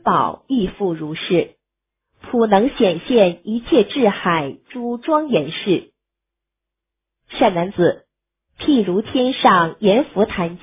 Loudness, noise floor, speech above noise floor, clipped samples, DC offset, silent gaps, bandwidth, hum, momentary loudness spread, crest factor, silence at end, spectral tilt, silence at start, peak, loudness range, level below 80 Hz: -18 LUFS; -83 dBFS; 65 dB; under 0.1%; under 0.1%; none; 3.9 kHz; none; 10 LU; 18 dB; 0.05 s; -10 dB/octave; 0.05 s; 0 dBFS; 5 LU; -50 dBFS